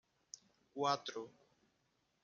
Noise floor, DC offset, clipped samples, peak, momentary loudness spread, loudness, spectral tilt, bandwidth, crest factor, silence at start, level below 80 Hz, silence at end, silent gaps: -81 dBFS; under 0.1%; under 0.1%; -22 dBFS; 19 LU; -40 LUFS; -3.5 dB/octave; 7.6 kHz; 24 dB; 0.75 s; under -90 dBFS; 0.95 s; none